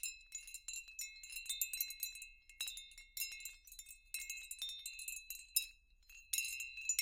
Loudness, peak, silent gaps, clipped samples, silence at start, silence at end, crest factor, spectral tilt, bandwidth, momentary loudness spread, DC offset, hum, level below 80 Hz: -43 LUFS; -18 dBFS; none; under 0.1%; 0 s; 0 s; 30 dB; 5 dB/octave; 17 kHz; 13 LU; under 0.1%; none; -70 dBFS